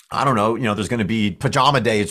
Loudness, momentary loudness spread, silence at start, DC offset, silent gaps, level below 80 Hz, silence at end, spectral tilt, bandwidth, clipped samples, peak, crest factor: -19 LUFS; 5 LU; 0.1 s; under 0.1%; none; -46 dBFS; 0 s; -5.5 dB/octave; 14.5 kHz; under 0.1%; -2 dBFS; 16 dB